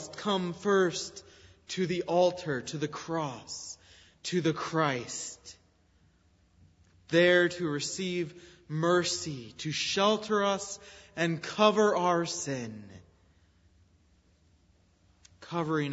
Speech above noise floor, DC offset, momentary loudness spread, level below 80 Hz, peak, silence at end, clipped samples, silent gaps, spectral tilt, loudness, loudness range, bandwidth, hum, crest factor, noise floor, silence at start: 36 dB; under 0.1%; 15 LU; -68 dBFS; -10 dBFS; 0 s; under 0.1%; none; -4 dB/octave; -30 LUFS; 6 LU; 8 kHz; none; 22 dB; -66 dBFS; 0 s